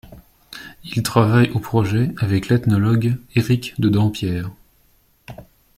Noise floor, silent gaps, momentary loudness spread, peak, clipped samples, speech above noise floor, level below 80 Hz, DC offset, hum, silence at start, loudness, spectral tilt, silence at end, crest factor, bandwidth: -58 dBFS; none; 21 LU; -2 dBFS; under 0.1%; 40 dB; -48 dBFS; under 0.1%; none; 0.1 s; -19 LUFS; -7 dB/octave; 0.35 s; 18 dB; 15.5 kHz